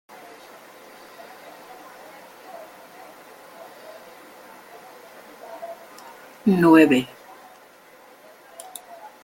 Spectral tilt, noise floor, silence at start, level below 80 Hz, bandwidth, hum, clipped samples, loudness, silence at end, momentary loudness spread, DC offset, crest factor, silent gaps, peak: -6 dB/octave; -50 dBFS; 5.5 s; -68 dBFS; 17 kHz; none; under 0.1%; -17 LUFS; 0.15 s; 26 LU; under 0.1%; 24 dB; none; -2 dBFS